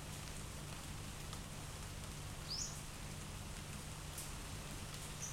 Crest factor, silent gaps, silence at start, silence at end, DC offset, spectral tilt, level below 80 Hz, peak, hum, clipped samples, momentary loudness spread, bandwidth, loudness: 18 dB; none; 0 s; 0 s; under 0.1%; -3 dB/octave; -54 dBFS; -30 dBFS; none; under 0.1%; 5 LU; 16.5 kHz; -47 LUFS